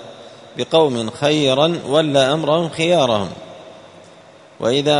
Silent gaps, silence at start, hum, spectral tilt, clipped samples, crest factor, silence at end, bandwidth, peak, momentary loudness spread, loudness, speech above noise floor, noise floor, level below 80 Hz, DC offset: none; 0 s; none; -5 dB/octave; under 0.1%; 18 dB; 0 s; 11 kHz; 0 dBFS; 16 LU; -17 LUFS; 28 dB; -44 dBFS; -58 dBFS; under 0.1%